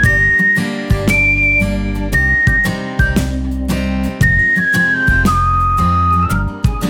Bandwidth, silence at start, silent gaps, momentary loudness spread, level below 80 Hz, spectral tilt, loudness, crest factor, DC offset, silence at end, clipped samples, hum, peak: 19 kHz; 0 s; none; 8 LU; -22 dBFS; -6 dB/octave; -13 LUFS; 12 dB; under 0.1%; 0 s; under 0.1%; none; 0 dBFS